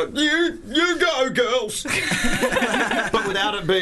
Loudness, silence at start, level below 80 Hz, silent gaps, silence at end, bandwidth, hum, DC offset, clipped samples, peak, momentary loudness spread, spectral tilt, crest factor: -20 LUFS; 0 s; -38 dBFS; none; 0 s; 12.5 kHz; none; under 0.1%; under 0.1%; -8 dBFS; 3 LU; -3 dB/octave; 12 dB